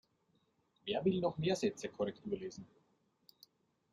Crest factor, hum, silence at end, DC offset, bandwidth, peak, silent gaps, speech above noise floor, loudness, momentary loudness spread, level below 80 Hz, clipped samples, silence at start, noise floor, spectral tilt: 20 dB; none; 1.25 s; under 0.1%; 13.5 kHz; -20 dBFS; none; 40 dB; -38 LUFS; 14 LU; -74 dBFS; under 0.1%; 0.85 s; -77 dBFS; -6 dB/octave